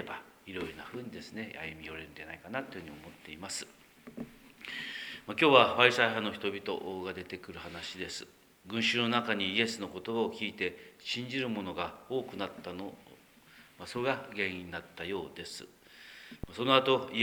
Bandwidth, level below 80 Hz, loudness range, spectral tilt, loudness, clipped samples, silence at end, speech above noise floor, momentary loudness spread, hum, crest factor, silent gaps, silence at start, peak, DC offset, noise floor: over 20 kHz; -64 dBFS; 13 LU; -4 dB/octave; -32 LUFS; under 0.1%; 0 s; 25 dB; 21 LU; none; 28 dB; none; 0 s; -6 dBFS; under 0.1%; -59 dBFS